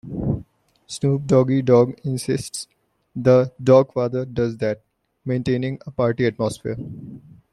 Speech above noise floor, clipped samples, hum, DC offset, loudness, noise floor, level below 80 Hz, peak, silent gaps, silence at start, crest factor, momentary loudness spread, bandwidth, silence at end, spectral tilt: 28 dB; under 0.1%; none; under 0.1%; -21 LUFS; -48 dBFS; -50 dBFS; -2 dBFS; none; 0.05 s; 18 dB; 18 LU; 12.5 kHz; 0.35 s; -7 dB/octave